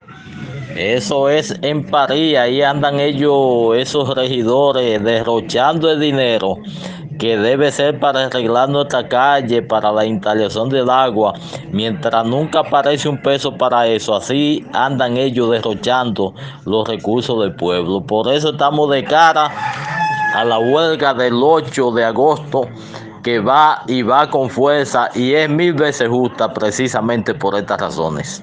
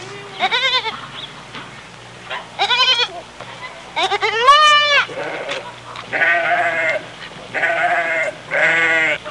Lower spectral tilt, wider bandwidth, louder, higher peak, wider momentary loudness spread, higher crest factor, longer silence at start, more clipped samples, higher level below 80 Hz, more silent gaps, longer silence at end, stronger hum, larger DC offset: first, -5 dB/octave vs -1.5 dB/octave; second, 9.8 kHz vs 11.5 kHz; about the same, -15 LUFS vs -15 LUFS; about the same, 0 dBFS vs -2 dBFS; second, 7 LU vs 21 LU; about the same, 14 dB vs 16 dB; about the same, 0.1 s vs 0 s; neither; about the same, -56 dBFS vs -58 dBFS; neither; about the same, 0 s vs 0 s; neither; neither